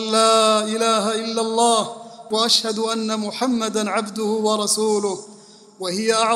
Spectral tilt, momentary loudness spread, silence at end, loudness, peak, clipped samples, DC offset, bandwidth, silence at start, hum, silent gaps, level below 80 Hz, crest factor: -2.5 dB/octave; 10 LU; 0 s; -19 LUFS; -2 dBFS; under 0.1%; under 0.1%; 15 kHz; 0 s; none; none; -68 dBFS; 18 dB